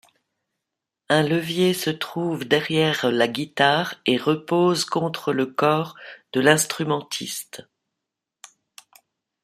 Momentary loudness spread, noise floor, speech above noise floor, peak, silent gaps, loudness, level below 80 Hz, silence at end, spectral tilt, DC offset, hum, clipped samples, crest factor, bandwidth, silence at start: 9 LU; -84 dBFS; 62 dB; -2 dBFS; none; -22 LUFS; -66 dBFS; 1.85 s; -4 dB/octave; under 0.1%; none; under 0.1%; 20 dB; 15.5 kHz; 1.1 s